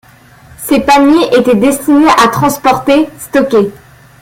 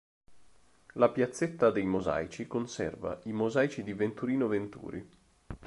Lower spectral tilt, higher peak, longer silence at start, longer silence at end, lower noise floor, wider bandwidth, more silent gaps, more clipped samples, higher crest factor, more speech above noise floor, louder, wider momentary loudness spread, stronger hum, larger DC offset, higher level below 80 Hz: second, -4.5 dB/octave vs -6.5 dB/octave; first, 0 dBFS vs -10 dBFS; first, 0.6 s vs 0.3 s; first, 0.5 s vs 0 s; second, -39 dBFS vs -62 dBFS; first, 17 kHz vs 11.5 kHz; neither; neither; second, 10 dB vs 22 dB; about the same, 31 dB vs 31 dB; first, -9 LUFS vs -31 LUFS; second, 7 LU vs 15 LU; neither; neither; first, -42 dBFS vs -58 dBFS